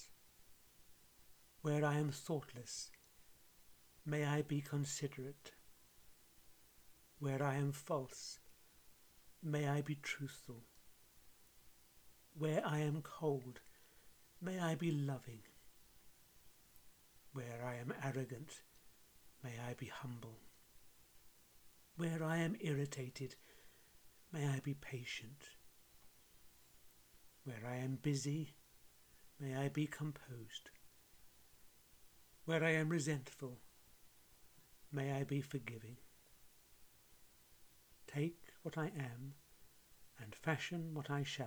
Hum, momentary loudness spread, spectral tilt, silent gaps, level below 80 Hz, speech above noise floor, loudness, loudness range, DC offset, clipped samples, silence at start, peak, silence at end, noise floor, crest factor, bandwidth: none; 25 LU; -5.5 dB/octave; none; -76 dBFS; 24 dB; -43 LUFS; 7 LU; under 0.1%; under 0.1%; 0 s; -24 dBFS; 0 s; -66 dBFS; 22 dB; over 20 kHz